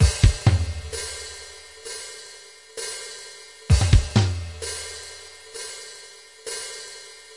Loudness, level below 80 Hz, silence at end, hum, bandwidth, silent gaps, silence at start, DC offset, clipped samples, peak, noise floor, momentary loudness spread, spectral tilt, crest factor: -25 LUFS; -30 dBFS; 0 s; none; 11.5 kHz; none; 0 s; under 0.1%; under 0.1%; -4 dBFS; -45 dBFS; 21 LU; -4.5 dB/octave; 20 dB